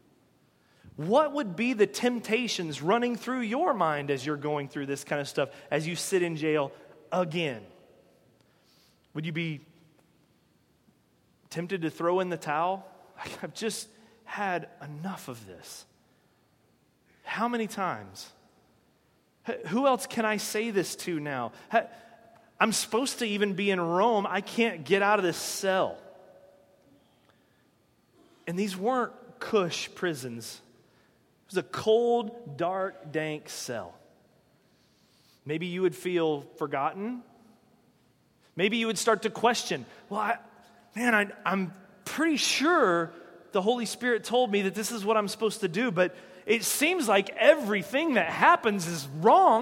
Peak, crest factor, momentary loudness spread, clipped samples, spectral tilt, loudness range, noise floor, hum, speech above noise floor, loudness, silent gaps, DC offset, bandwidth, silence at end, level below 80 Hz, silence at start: -4 dBFS; 24 dB; 15 LU; under 0.1%; -4 dB/octave; 10 LU; -67 dBFS; none; 39 dB; -28 LUFS; none; under 0.1%; 17 kHz; 0 s; -76 dBFS; 0.85 s